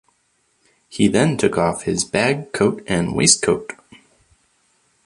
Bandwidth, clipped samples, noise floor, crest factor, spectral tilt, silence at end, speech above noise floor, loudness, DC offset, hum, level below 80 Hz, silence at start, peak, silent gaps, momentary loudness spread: 11.5 kHz; under 0.1%; -65 dBFS; 20 dB; -4 dB/octave; 1.3 s; 47 dB; -18 LUFS; under 0.1%; none; -48 dBFS; 0.9 s; 0 dBFS; none; 8 LU